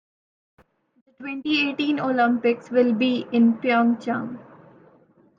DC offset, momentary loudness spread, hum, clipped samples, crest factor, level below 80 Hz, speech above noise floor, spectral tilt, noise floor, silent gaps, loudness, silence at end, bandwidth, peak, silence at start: under 0.1%; 13 LU; none; under 0.1%; 16 dB; -74 dBFS; 35 dB; -6.5 dB/octave; -57 dBFS; none; -22 LUFS; 0.95 s; 7 kHz; -8 dBFS; 1.2 s